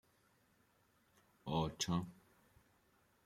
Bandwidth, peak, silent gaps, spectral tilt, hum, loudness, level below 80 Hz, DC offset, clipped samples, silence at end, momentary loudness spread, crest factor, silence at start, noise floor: 15.5 kHz; -24 dBFS; none; -5 dB/octave; none; -40 LUFS; -66 dBFS; under 0.1%; under 0.1%; 1.1 s; 15 LU; 22 dB; 1.45 s; -75 dBFS